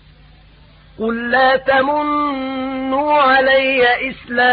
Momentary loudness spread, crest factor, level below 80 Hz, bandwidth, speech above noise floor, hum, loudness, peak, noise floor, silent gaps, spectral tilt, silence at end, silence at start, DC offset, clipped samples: 10 LU; 12 dB; -48 dBFS; 5 kHz; 30 dB; none; -15 LUFS; -4 dBFS; -45 dBFS; none; -9 dB/octave; 0 s; 1 s; under 0.1%; under 0.1%